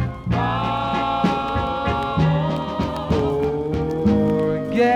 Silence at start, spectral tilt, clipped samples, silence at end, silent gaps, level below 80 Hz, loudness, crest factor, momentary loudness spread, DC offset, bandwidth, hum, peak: 0 s; -8 dB/octave; under 0.1%; 0 s; none; -38 dBFS; -21 LUFS; 14 dB; 5 LU; under 0.1%; 10.5 kHz; none; -6 dBFS